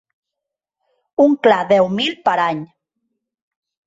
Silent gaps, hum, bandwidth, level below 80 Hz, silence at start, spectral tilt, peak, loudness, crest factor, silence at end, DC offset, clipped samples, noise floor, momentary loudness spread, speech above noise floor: none; none; 7.8 kHz; -62 dBFS; 1.2 s; -6 dB/octave; -2 dBFS; -16 LUFS; 18 dB; 1.2 s; under 0.1%; under 0.1%; -83 dBFS; 10 LU; 68 dB